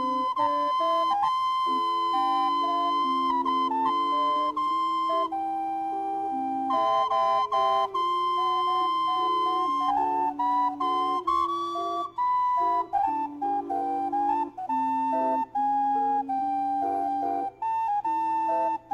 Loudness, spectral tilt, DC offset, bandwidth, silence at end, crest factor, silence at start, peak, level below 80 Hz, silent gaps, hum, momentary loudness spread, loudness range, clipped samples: -26 LUFS; -4 dB/octave; under 0.1%; 11 kHz; 0 s; 12 dB; 0 s; -14 dBFS; -66 dBFS; none; none; 5 LU; 2 LU; under 0.1%